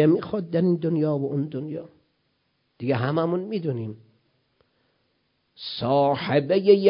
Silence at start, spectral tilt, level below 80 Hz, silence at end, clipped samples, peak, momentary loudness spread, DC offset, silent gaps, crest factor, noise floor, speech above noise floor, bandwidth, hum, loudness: 0 s; -11.5 dB/octave; -64 dBFS; 0 s; under 0.1%; -4 dBFS; 13 LU; under 0.1%; none; 20 dB; -71 dBFS; 49 dB; 5.4 kHz; none; -24 LUFS